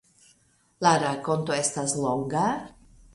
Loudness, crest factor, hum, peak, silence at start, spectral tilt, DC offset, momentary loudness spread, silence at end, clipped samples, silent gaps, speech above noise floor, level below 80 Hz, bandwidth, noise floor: -26 LUFS; 20 dB; none; -8 dBFS; 0.8 s; -4 dB/octave; under 0.1%; 6 LU; 0.45 s; under 0.1%; none; 38 dB; -60 dBFS; 11.5 kHz; -64 dBFS